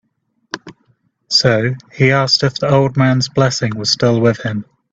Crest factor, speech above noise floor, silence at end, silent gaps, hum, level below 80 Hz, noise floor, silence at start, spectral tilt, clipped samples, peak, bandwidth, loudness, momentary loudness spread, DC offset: 16 dB; 48 dB; 0.3 s; none; none; -50 dBFS; -62 dBFS; 0.55 s; -5 dB/octave; under 0.1%; 0 dBFS; 7.8 kHz; -14 LUFS; 15 LU; under 0.1%